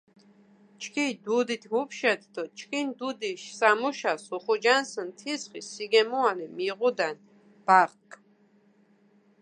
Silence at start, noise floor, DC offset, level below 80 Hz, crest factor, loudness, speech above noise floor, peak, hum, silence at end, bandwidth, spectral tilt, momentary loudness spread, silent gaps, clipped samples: 0.8 s; -62 dBFS; under 0.1%; -86 dBFS; 24 dB; -27 LUFS; 35 dB; -6 dBFS; none; 1.25 s; 10 kHz; -3 dB/octave; 13 LU; none; under 0.1%